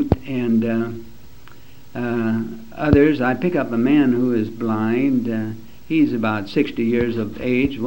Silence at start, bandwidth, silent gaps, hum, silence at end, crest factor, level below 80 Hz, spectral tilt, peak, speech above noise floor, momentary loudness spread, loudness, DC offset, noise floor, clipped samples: 0 s; 16 kHz; none; none; 0 s; 20 dB; -40 dBFS; -8.5 dB/octave; 0 dBFS; 27 dB; 11 LU; -20 LUFS; 1%; -46 dBFS; under 0.1%